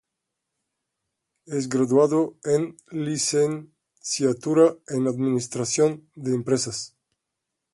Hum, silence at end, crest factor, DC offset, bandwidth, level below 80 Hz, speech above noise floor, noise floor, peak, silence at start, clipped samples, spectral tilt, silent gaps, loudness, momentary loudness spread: none; 0.85 s; 18 dB; under 0.1%; 11.5 kHz; -66 dBFS; 60 dB; -83 dBFS; -6 dBFS; 1.5 s; under 0.1%; -5 dB/octave; none; -23 LUFS; 12 LU